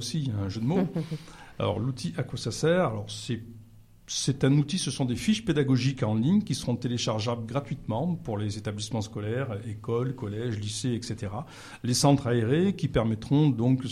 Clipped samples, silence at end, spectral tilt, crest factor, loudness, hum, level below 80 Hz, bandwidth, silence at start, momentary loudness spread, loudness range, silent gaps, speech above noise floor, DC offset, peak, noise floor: under 0.1%; 0 s; -6 dB/octave; 18 dB; -28 LUFS; none; -52 dBFS; 14 kHz; 0 s; 10 LU; 5 LU; none; 24 dB; under 0.1%; -10 dBFS; -52 dBFS